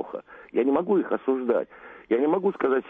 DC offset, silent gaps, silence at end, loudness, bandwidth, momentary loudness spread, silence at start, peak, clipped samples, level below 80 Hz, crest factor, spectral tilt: under 0.1%; none; 0 s; -25 LUFS; 3.8 kHz; 12 LU; 0 s; -12 dBFS; under 0.1%; -68 dBFS; 14 dB; -9.5 dB/octave